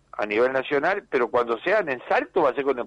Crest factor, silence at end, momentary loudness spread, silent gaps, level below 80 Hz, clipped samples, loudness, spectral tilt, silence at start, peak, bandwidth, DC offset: 12 dB; 0 s; 2 LU; none; -62 dBFS; under 0.1%; -23 LUFS; -6 dB/octave; 0.15 s; -12 dBFS; 8.8 kHz; under 0.1%